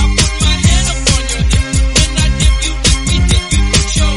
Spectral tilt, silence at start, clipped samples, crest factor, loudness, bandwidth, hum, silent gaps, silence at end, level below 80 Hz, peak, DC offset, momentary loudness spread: -3.5 dB/octave; 0 s; under 0.1%; 12 dB; -12 LUFS; 12 kHz; none; none; 0 s; -14 dBFS; 0 dBFS; under 0.1%; 2 LU